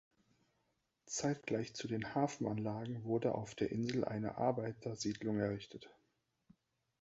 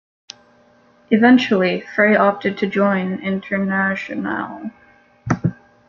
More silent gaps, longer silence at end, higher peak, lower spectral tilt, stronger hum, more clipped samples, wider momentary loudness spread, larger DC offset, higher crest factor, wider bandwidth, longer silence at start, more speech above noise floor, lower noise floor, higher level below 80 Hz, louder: neither; first, 1.1 s vs 0.35 s; second, -20 dBFS vs -2 dBFS; about the same, -6 dB/octave vs -7 dB/octave; neither; neither; second, 6 LU vs 13 LU; neither; about the same, 20 dB vs 18 dB; first, 8 kHz vs 7.2 kHz; about the same, 1.05 s vs 1.1 s; first, 44 dB vs 36 dB; first, -83 dBFS vs -53 dBFS; second, -70 dBFS vs -56 dBFS; second, -39 LUFS vs -18 LUFS